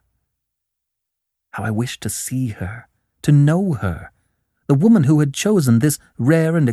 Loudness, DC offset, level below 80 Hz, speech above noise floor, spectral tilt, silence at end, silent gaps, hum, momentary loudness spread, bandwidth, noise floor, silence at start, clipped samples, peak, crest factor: -17 LUFS; under 0.1%; -48 dBFS; 63 dB; -6.5 dB/octave; 0 s; none; none; 16 LU; 13.5 kHz; -80 dBFS; 1.55 s; under 0.1%; -2 dBFS; 18 dB